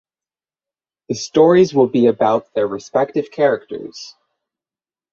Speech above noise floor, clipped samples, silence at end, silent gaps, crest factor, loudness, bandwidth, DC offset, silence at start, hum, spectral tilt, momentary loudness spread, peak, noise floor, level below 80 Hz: over 74 dB; under 0.1%; 1.05 s; none; 16 dB; -16 LUFS; 7.6 kHz; under 0.1%; 1.1 s; none; -6 dB/octave; 18 LU; -2 dBFS; under -90 dBFS; -60 dBFS